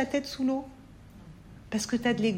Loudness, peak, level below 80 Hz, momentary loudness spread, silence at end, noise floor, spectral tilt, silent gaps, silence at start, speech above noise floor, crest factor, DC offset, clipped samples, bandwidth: -30 LUFS; -16 dBFS; -56 dBFS; 23 LU; 0 s; -50 dBFS; -4.5 dB/octave; none; 0 s; 21 dB; 16 dB; under 0.1%; under 0.1%; 16 kHz